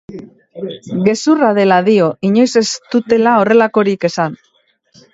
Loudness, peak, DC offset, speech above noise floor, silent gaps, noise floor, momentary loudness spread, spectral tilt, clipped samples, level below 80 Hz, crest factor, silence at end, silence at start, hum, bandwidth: -13 LUFS; 0 dBFS; under 0.1%; 40 dB; none; -53 dBFS; 16 LU; -5.5 dB/octave; under 0.1%; -58 dBFS; 14 dB; 0.8 s; 0.1 s; none; 8 kHz